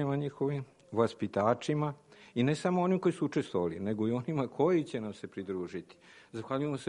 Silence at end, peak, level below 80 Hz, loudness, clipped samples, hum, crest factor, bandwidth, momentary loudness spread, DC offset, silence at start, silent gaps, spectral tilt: 0 s; -14 dBFS; -70 dBFS; -33 LUFS; under 0.1%; none; 18 dB; 11 kHz; 12 LU; under 0.1%; 0 s; none; -7.5 dB/octave